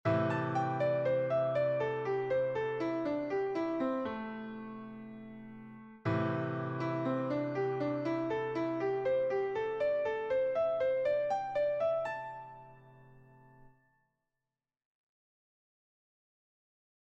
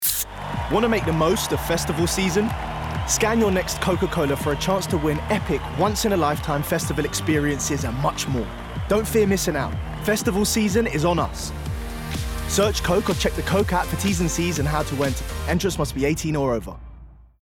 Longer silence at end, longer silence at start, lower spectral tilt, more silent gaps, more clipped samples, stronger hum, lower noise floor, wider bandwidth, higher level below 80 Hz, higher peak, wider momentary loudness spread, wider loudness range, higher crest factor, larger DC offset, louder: first, 3.35 s vs 0.2 s; about the same, 0.05 s vs 0 s; first, -8 dB/octave vs -4.5 dB/octave; neither; neither; neither; first, under -90 dBFS vs -44 dBFS; second, 7.8 kHz vs 17.5 kHz; second, -70 dBFS vs -34 dBFS; second, -20 dBFS vs -8 dBFS; first, 15 LU vs 8 LU; first, 6 LU vs 1 LU; about the same, 16 dB vs 14 dB; neither; second, -34 LUFS vs -23 LUFS